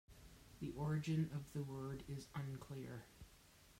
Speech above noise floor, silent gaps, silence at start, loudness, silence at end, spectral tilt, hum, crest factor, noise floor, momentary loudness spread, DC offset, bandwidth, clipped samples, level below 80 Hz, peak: 22 dB; none; 0.1 s; -46 LUFS; 0 s; -7 dB/octave; none; 16 dB; -67 dBFS; 22 LU; under 0.1%; 16 kHz; under 0.1%; -66 dBFS; -30 dBFS